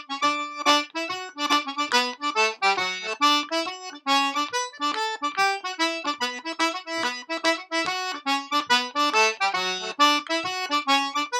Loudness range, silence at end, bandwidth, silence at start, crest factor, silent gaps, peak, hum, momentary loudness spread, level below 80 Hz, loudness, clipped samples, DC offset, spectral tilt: 3 LU; 0 s; 18.5 kHz; 0 s; 18 dB; none; -6 dBFS; none; 7 LU; -84 dBFS; -24 LUFS; under 0.1%; under 0.1%; -0.5 dB/octave